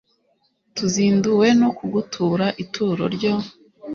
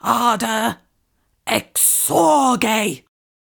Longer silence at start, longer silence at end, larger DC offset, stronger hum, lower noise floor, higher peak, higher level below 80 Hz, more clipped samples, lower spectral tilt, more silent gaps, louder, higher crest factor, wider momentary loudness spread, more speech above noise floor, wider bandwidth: first, 0.75 s vs 0.05 s; second, 0 s vs 0.5 s; neither; neither; about the same, -66 dBFS vs -66 dBFS; about the same, -4 dBFS vs -2 dBFS; about the same, -58 dBFS vs -58 dBFS; neither; first, -5.5 dB/octave vs -2.5 dB/octave; neither; second, -20 LUFS vs -17 LUFS; about the same, 16 dB vs 16 dB; second, 10 LU vs 13 LU; about the same, 47 dB vs 48 dB; second, 7.4 kHz vs over 20 kHz